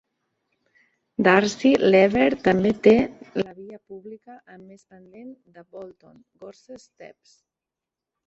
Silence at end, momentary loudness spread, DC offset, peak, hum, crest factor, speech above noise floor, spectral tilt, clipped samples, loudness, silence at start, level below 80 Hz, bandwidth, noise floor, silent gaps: 1.25 s; 25 LU; under 0.1%; -2 dBFS; none; 22 dB; 65 dB; -6 dB/octave; under 0.1%; -19 LUFS; 1.2 s; -58 dBFS; 7.8 kHz; -88 dBFS; none